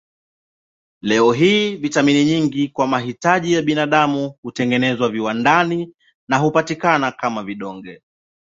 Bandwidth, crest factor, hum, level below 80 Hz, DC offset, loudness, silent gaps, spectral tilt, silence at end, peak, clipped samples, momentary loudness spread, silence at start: 7.8 kHz; 16 dB; none; -58 dBFS; under 0.1%; -17 LUFS; 4.38-4.43 s, 6.14-6.27 s; -5 dB/octave; 0.5 s; -2 dBFS; under 0.1%; 12 LU; 1.05 s